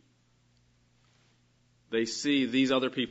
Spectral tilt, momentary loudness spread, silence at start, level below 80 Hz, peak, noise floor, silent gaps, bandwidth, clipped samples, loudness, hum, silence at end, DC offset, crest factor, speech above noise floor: -4 dB/octave; 6 LU; 1.9 s; -76 dBFS; -14 dBFS; -67 dBFS; none; 8 kHz; under 0.1%; -28 LUFS; 60 Hz at -65 dBFS; 0 s; under 0.1%; 18 dB; 40 dB